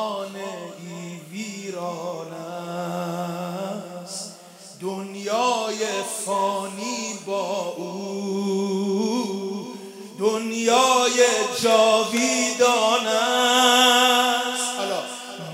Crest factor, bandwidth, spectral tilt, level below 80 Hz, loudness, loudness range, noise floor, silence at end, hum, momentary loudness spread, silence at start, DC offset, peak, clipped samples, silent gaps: 20 dB; 16 kHz; -2.5 dB/octave; -80 dBFS; -22 LUFS; 13 LU; -44 dBFS; 0 s; none; 17 LU; 0 s; under 0.1%; -4 dBFS; under 0.1%; none